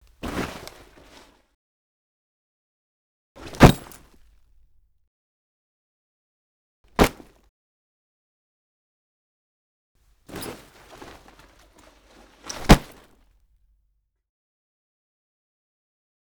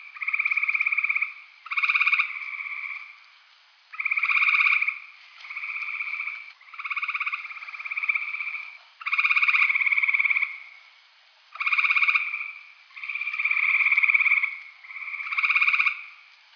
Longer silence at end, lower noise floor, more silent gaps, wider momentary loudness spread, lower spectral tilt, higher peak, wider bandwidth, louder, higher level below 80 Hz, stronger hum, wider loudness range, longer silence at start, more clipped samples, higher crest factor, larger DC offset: first, 3.55 s vs 0.4 s; first, -71 dBFS vs -57 dBFS; first, 1.54-3.35 s, 5.07-6.84 s, 7.49-9.95 s vs none; first, 29 LU vs 17 LU; first, -5.5 dB/octave vs 8 dB/octave; first, -2 dBFS vs -6 dBFS; first, over 20 kHz vs 5.4 kHz; about the same, -21 LUFS vs -22 LUFS; first, -34 dBFS vs under -90 dBFS; neither; first, 20 LU vs 7 LU; first, 0.25 s vs 0 s; neither; first, 26 dB vs 20 dB; neither